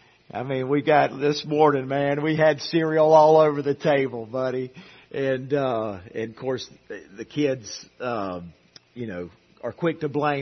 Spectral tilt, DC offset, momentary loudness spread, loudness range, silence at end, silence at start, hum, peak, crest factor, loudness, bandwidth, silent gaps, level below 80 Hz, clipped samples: -6 dB/octave; under 0.1%; 18 LU; 11 LU; 0 s; 0.35 s; none; -4 dBFS; 20 dB; -23 LUFS; 6.4 kHz; none; -66 dBFS; under 0.1%